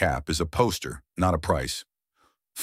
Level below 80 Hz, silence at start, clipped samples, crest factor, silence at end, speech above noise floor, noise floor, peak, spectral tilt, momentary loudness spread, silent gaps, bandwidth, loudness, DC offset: -40 dBFS; 0 s; under 0.1%; 20 dB; 0 s; 42 dB; -69 dBFS; -8 dBFS; -4.5 dB/octave; 11 LU; none; 16 kHz; -27 LUFS; under 0.1%